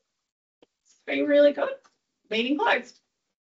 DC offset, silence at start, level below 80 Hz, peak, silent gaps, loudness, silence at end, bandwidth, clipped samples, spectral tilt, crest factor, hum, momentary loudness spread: under 0.1%; 1.05 s; -78 dBFS; -8 dBFS; none; -24 LUFS; 0.65 s; 7.6 kHz; under 0.1%; -0.5 dB/octave; 18 dB; none; 14 LU